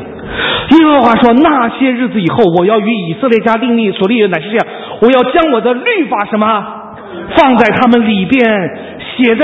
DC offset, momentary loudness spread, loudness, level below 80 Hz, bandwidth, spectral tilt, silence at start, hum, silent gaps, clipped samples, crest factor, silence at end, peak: under 0.1%; 9 LU; -10 LUFS; -42 dBFS; 6.8 kHz; -7.5 dB/octave; 0 s; none; none; 0.5%; 10 dB; 0 s; 0 dBFS